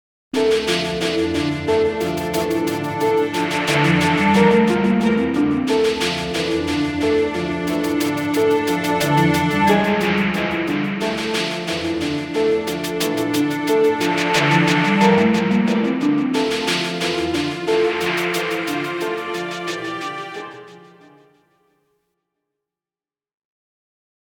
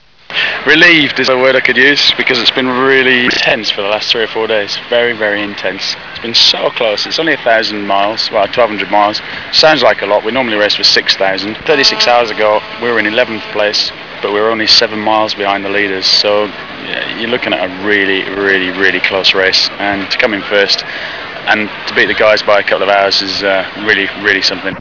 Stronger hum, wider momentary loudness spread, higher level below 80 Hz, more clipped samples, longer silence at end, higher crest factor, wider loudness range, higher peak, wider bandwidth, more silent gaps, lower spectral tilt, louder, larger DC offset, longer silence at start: neither; about the same, 8 LU vs 9 LU; about the same, -48 dBFS vs -48 dBFS; second, under 0.1% vs 0.5%; first, 3.55 s vs 0 s; about the same, 16 dB vs 12 dB; first, 8 LU vs 3 LU; second, -4 dBFS vs 0 dBFS; first, 19 kHz vs 5.4 kHz; neither; first, -5 dB/octave vs -2.5 dB/octave; second, -19 LUFS vs -10 LUFS; second, under 0.1% vs 0.5%; about the same, 0.35 s vs 0.3 s